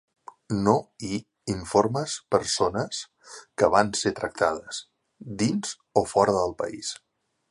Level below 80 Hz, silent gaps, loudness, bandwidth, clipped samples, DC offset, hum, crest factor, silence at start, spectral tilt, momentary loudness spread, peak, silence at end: -54 dBFS; none; -26 LUFS; 11.5 kHz; under 0.1%; under 0.1%; none; 22 dB; 0.5 s; -4.5 dB/octave; 14 LU; -4 dBFS; 0.55 s